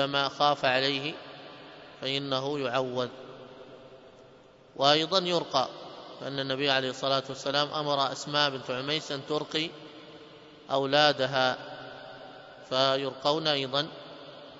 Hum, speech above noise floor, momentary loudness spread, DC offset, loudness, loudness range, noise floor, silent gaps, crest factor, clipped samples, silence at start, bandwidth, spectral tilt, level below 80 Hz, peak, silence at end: none; 27 dB; 22 LU; under 0.1%; -28 LUFS; 4 LU; -55 dBFS; none; 24 dB; under 0.1%; 0 s; 8 kHz; -4 dB/octave; -72 dBFS; -6 dBFS; 0 s